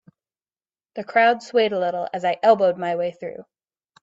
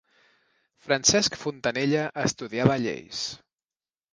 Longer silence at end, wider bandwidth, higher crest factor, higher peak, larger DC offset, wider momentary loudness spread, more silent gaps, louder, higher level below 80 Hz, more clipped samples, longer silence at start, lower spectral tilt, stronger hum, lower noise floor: second, 0.6 s vs 0.75 s; second, 7.8 kHz vs 10.5 kHz; second, 18 dB vs 24 dB; about the same, -4 dBFS vs -2 dBFS; neither; first, 18 LU vs 12 LU; neither; first, -20 LUFS vs -25 LUFS; second, -72 dBFS vs -58 dBFS; neither; about the same, 0.95 s vs 0.85 s; first, -5 dB/octave vs -3.5 dB/octave; neither; about the same, under -90 dBFS vs under -90 dBFS